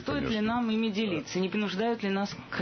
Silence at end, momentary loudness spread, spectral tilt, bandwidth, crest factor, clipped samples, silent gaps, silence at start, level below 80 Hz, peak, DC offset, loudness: 0 s; 3 LU; -5.5 dB/octave; 6.6 kHz; 12 dB; under 0.1%; none; 0 s; -56 dBFS; -18 dBFS; under 0.1%; -30 LUFS